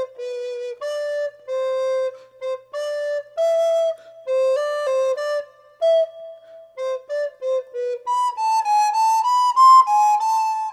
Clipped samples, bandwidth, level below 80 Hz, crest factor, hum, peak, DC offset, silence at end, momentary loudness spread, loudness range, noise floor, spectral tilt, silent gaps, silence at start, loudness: under 0.1%; 14.5 kHz; -80 dBFS; 14 dB; 60 Hz at -75 dBFS; -6 dBFS; under 0.1%; 0 s; 12 LU; 7 LU; -42 dBFS; 1.5 dB/octave; none; 0 s; -20 LUFS